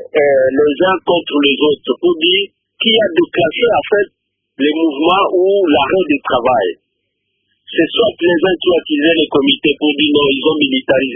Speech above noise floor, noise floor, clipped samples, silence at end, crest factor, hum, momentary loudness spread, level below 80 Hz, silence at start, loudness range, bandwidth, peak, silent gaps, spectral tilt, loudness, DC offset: 57 dB; -70 dBFS; under 0.1%; 0 s; 14 dB; none; 4 LU; -50 dBFS; 0 s; 2 LU; 3.8 kHz; 0 dBFS; none; -8 dB/octave; -13 LUFS; under 0.1%